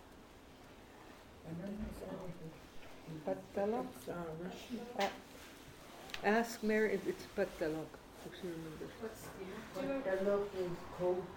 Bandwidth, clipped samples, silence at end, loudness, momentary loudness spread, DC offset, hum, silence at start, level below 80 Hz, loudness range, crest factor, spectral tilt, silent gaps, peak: 17.5 kHz; under 0.1%; 0 s; -40 LUFS; 21 LU; under 0.1%; none; 0 s; -62 dBFS; 6 LU; 22 dB; -5.5 dB/octave; none; -18 dBFS